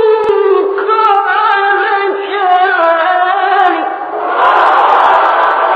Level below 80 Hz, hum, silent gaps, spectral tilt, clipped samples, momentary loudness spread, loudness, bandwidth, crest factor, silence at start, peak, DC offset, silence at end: -60 dBFS; none; none; -3.5 dB/octave; under 0.1%; 6 LU; -10 LUFS; 7.2 kHz; 10 dB; 0 s; 0 dBFS; under 0.1%; 0 s